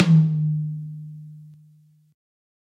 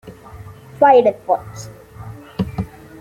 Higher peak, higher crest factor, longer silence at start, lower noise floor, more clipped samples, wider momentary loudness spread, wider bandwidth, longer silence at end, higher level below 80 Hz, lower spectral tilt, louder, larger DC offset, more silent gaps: about the same, -4 dBFS vs -2 dBFS; about the same, 20 dB vs 18 dB; about the same, 0 s vs 0.05 s; first, -55 dBFS vs -38 dBFS; neither; about the same, 25 LU vs 27 LU; second, 6 kHz vs 16 kHz; first, 1.2 s vs 0.35 s; second, -66 dBFS vs -46 dBFS; first, -8.5 dB/octave vs -6.5 dB/octave; second, -22 LUFS vs -16 LUFS; neither; neither